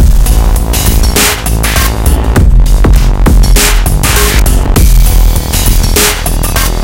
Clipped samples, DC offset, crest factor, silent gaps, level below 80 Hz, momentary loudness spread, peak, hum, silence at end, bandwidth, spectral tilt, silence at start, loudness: 5%; under 0.1%; 6 dB; none; -6 dBFS; 3 LU; 0 dBFS; none; 0 s; 17.5 kHz; -4 dB/octave; 0 s; -8 LUFS